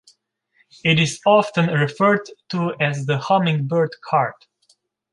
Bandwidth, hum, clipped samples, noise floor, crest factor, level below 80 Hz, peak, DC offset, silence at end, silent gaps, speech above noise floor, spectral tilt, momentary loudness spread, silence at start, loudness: 11.5 kHz; none; under 0.1%; -64 dBFS; 18 dB; -62 dBFS; -2 dBFS; under 0.1%; 0.8 s; none; 45 dB; -5.5 dB/octave; 8 LU; 0.85 s; -19 LUFS